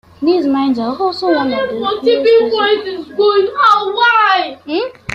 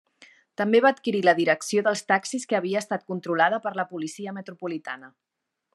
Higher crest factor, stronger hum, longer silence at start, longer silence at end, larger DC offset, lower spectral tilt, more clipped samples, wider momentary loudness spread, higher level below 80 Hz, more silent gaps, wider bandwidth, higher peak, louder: second, 12 dB vs 20 dB; neither; second, 0.2 s vs 0.6 s; second, 0 s vs 0.65 s; neither; about the same, -5 dB/octave vs -4.5 dB/octave; neither; second, 8 LU vs 15 LU; first, -54 dBFS vs -82 dBFS; neither; second, 9.2 kHz vs 12.5 kHz; first, -2 dBFS vs -6 dBFS; first, -13 LUFS vs -24 LUFS